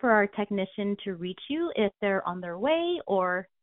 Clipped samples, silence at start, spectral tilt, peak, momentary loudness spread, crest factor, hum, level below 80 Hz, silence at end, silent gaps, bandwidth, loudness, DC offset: under 0.1%; 0.05 s; -3.5 dB/octave; -8 dBFS; 8 LU; 20 dB; none; -66 dBFS; 0.2 s; none; 4 kHz; -29 LUFS; under 0.1%